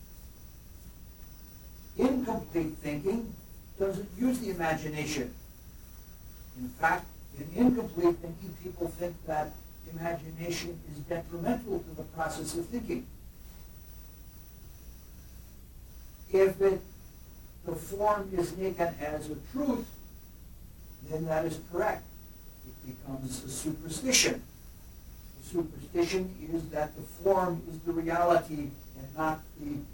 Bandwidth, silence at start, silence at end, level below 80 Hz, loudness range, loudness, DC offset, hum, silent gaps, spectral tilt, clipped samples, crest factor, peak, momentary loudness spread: 17.5 kHz; 0 s; 0 s; -50 dBFS; 6 LU; -32 LUFS; under 0.1%; none; none; -4.5 dB/octave; under 0.1%; 22 dB; -12 dBFS; 23 LU